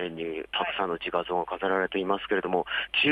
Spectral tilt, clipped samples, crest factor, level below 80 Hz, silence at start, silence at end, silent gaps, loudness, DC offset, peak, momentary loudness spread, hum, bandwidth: -6 dB/octave; under 0.1%; 18 dB; -60 dBFS; 0 s; 0 s; none; -28 LUFS; under 0.1%; -10 dBFS; 4 LU; none; 9.6 kHz